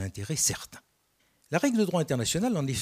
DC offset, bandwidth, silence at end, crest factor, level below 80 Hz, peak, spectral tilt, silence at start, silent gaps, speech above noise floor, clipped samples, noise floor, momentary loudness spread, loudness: under 0.1%; 15.5 kHz; 0 s; 20 dB; -58 dBFS; -10 dBFS; -4 dB/octave; 0 s; none; 42 dB; under 0.1%; -70 dBFS; 8 LU; -28 LUFS